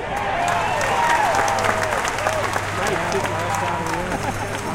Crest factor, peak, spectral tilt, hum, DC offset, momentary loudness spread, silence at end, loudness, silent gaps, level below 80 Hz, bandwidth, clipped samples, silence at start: 18 dB; -4 dBFS; -3.5 dB/octave; none; under 0.1%; 6 LU; 0 s; -21 LUFS; none; -40 dBFS; 17 kHz; under 0.1%; 0 s